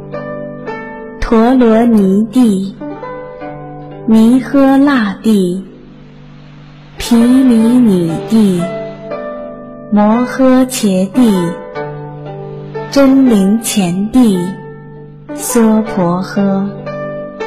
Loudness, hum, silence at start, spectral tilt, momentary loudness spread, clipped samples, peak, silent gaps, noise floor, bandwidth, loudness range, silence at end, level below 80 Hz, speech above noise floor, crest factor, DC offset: -11 LUFS; none; 0 s; -6 dB/octave; 18 LU; under 0.1%; 0 dBFS; none; -35 dBFS; 15 kHz; 1 LU; 0 s; -38 dBFS; 25 dB; 10 dB; under 0.1%